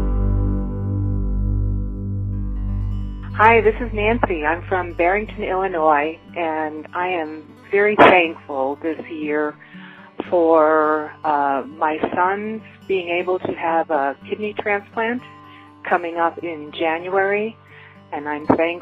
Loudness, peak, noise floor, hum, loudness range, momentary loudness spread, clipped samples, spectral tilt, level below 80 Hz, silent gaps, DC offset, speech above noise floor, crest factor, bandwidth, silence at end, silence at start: -20 LUFS; 0 dBFS; -44 dBFS; none; 5 LU; 13 LU; under 0.1%; -8.5 dB/octave; -30 dBFS; none; under 0.1%; 25 dB; 20 dB; 5.4 kHz; 0 s; 0 s